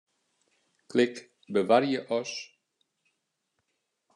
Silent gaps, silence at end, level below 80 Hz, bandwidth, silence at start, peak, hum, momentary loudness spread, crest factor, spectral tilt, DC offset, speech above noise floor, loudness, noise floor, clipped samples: none; 1.7 s; -84 dBFS; 10.5 kHz; 0.95 s; -8 dBFS; none; 17 LU; 22 dB; -5 dB/octave; under 0.1%; 54 dB; -28 LUFS; -80 dBFS; under 0.1%